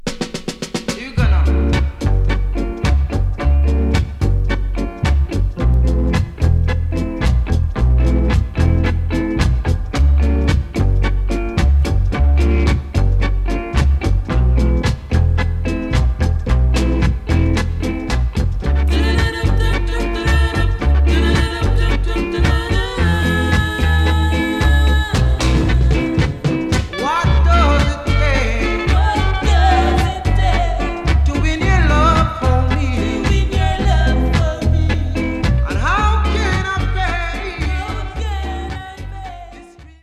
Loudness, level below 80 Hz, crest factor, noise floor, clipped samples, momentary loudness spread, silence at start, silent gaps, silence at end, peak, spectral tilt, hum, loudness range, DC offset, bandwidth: -17 LUFS; -16 dBFS; 14 dB; -39 dBFS; under 0.1%; 6 LU; 0.05 s; none; 0.15 s; -2 dBFS; -6.5 dB/octave; none; 3 LU; under 0.1%; 11 kHz